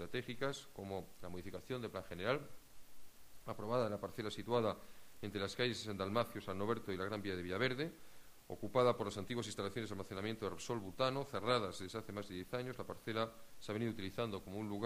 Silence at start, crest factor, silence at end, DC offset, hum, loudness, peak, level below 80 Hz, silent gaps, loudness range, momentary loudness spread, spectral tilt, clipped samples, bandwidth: 0 s; 22 dB; 0 s; under 0.1%; none; -42 LUFS; -20 dBFS; -68 dBFS; none; 4 LU; 11 LU; -5 dB/octave; under 0.1%; 15.5 kHz